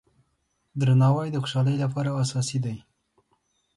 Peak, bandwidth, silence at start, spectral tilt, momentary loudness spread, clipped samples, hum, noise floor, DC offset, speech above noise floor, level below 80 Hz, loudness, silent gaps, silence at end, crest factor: -12 dBFS; 11.5 kHz; 0.75 s; -6.5 dB/octave; 12 LU; under 0.1%; none; -73 dBFS; under 0.1%; 50 dB; -62 dBFS; -25 LUFS; none; 1 s; 14 dB